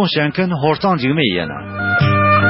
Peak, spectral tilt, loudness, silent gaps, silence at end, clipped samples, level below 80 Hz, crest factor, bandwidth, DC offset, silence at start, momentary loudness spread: 0 dBFS; -10.5 dB/octave; -16 LUFS; none; 0 s; under 0.1%; -46 dBFS; 14 dB; 5.8 kHz; under 0.1%; 0 s; 8 LU